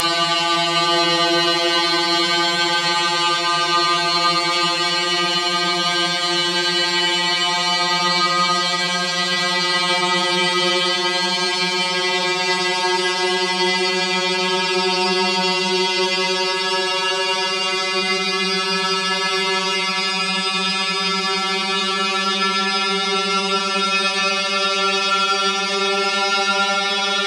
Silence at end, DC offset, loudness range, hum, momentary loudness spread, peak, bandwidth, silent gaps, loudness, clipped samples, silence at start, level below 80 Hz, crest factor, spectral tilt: 0 s; under 0.1%; 2 LU; none; 2 LU; -2 dBFS; 14.5 kHz; none; -17 LUFS; under 0.1%; 0 s; -74 dBFS; 16 dB; -2 dB/octave